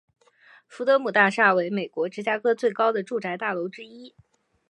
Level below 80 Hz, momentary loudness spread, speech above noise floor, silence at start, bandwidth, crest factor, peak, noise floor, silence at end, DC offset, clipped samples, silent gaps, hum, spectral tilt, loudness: -78 dBFS; 12 LU; 32 dB; 0.7 s; 11 kHz; 22 dB; -4 dBFS; -56 dBFS; 0.6 s; under 0.1%; under 0.1%; none; none; -5.5 dB/octave; -23 LUFS